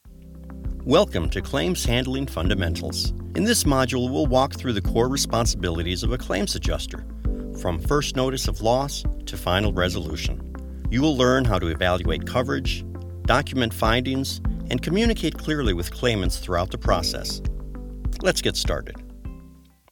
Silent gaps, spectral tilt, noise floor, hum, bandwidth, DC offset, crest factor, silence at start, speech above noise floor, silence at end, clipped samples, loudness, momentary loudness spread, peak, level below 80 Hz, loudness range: none; -4.5 dB/octave; -49 dBFS; none; 19 kHz; under 0.1%; 20 dB; 0.05 s; 26 dB; 0.35 s; under 0.1%; -24 LUFS; 12 LU; -4 dBFS; -30 dBFS; 3 LU